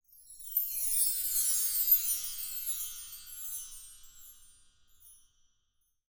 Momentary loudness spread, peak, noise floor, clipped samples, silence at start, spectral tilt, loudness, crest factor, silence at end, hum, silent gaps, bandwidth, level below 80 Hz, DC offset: 19 LU; -12 dBFS; -76 dBFS; under 0.1%; 0.15 s; 4 dB/octave; -29 LUFS; 22 dB; 0.95 s; none; none; over 20 kHz; -64 dBFS; under 0.1%